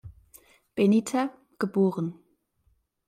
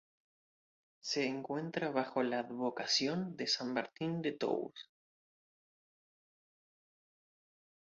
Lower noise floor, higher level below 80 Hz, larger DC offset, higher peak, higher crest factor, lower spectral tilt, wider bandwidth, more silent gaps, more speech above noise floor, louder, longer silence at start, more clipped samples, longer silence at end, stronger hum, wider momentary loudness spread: second, -69 dBFS vs under -90 dBFS; first, -64 dBFS vs -82 dBFS; neither; first, -12 dBFS vs -18 dBFS; about the same, 16 dB vs 20 dB; first, -7 dB/octave vs -3 dB/octave; first, 15.5 kHz vs 7.4 kHz; neither; second, 45 dB vs over 53 dB; first, -26 LUFS vs -36 LUFS; second, 0.05 s vs 1.05 s; neither; second, 0.95 s vs 3 s; neither; first, 12 LU vs 7 LU